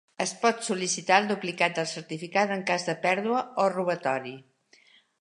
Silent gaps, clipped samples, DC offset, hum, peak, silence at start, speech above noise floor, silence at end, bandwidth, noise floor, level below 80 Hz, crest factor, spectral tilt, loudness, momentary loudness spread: none; under 0.1%; under 0.1%; none; -6 dBFS; 0.2 s; 33 dB; 0.8 s; 11.5 kHz; -60 dBFS; -80 dBFS; 22 dB; -3.5 dB/octave; -27 LUFS; 9 LU